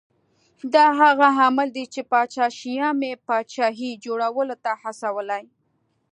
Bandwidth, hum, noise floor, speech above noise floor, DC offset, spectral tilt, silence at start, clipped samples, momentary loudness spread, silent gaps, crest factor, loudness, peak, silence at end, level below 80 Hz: 10.5 kHz; none; -69 dBFS; 48 dB; under 0.1%; -3 dB/octave; 0.65 s; under 0.1%; 13 LU; none; 20 dB; -21 LUFS; -2 dBFS; 0.7 s; -80 dBFS